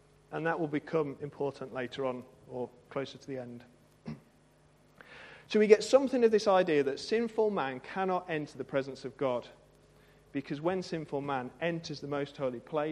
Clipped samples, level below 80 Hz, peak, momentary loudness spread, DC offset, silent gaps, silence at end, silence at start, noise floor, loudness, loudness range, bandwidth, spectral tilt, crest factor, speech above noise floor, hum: under 0.1%; -70 dBFS; -6 dBFS; 18 LU; under 0.1%; none; 0 s; 0.3 s; -64 dBFS; -32 LUFS; 13 LU; 11 kHz; -5.5 dB/octave; 26 dB; 32 dB; none